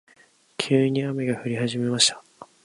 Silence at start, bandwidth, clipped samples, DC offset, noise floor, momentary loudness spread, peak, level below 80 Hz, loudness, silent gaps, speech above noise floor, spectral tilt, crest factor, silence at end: 0.6 s; 11.5 kHz; under 0.1%; under 0.1%; -58 dBFS; 12 LU; -4 dBFS; -68 dBFS; -23 LUFS; none; 35 dB; -4 dB/octave; 22 dB; 0.2 s